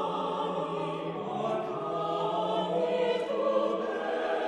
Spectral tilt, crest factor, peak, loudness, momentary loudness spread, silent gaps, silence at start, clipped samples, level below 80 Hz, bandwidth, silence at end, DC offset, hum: -6 dB/octave; 14 dB; -16 dBFS; -31 LUFS; 5 LU; none; 0 s; under 0.1%; -72 dBFS; 10.5 kHz; 0 s; under 0.1%; none